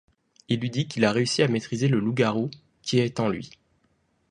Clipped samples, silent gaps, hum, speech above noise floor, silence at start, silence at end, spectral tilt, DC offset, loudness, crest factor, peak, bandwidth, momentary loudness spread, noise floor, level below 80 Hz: under 0.1%; none; none; 44 dB; 0.5 s; 0.8 s; -5.5 dB/octave; under 0.1%; -25 LUFS; 20 dB; -6 dBFS; 11 kHz; 10 LU; -68 dBFS; -62 dBFS